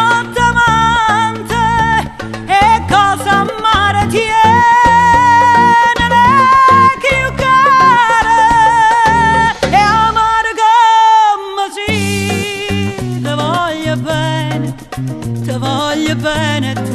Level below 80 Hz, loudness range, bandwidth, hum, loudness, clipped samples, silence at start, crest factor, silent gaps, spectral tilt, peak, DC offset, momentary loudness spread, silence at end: -32 dBFS; 8 LU; 13 kHz; none; -10 LUFS; under 0.1%; 0 s; 10 dB; none; -4.5 dB/octave; 0 dBFS; under 0.1%; 10 LU; 0 s